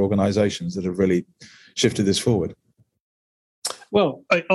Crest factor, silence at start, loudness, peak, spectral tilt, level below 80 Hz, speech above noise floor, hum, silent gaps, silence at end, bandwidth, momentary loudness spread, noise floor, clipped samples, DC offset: 18 dB; 0 s; -22 LUFS; -4 dBFS; -5 dB/octave; -54 dBFS; over 69 dB; none; 3.00-3.62 s; 0 s; 12.5 kHz; 11 LU; under -90 dBFS; under 0.1%; under 0.1%